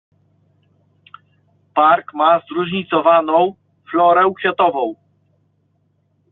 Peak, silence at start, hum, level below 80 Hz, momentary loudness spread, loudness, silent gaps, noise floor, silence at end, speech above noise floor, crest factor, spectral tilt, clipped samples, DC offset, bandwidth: -2 dBFS; 1.75 s; none; -66 dBFS; 9 LU; -16 LUFS; none; -63 dBFS; 1.4 s; 48 dB; 16 dB; -3 dB/octave; under 0.1%; under 0.1%; 4.1 kHz